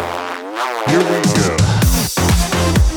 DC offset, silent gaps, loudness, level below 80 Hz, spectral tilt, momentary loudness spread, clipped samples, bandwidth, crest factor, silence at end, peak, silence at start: under 0.1%; none; -15 LUFS; -22 dBFS; -4.5 dB/octave; 8 LU; under 0.1%; over 20 kHz; 12 dB; 0 s; -2 dBFS; 0 s